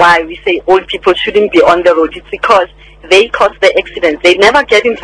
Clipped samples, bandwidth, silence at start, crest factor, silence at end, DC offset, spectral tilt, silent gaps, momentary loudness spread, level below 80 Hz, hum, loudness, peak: 3%; 11 kHz; 0 s; 10 dB; 0 s; 0.1%; -3.5 dB/octave; none; 7 LU; -38 dBFS; none; -9 LUFS; 0 dBFS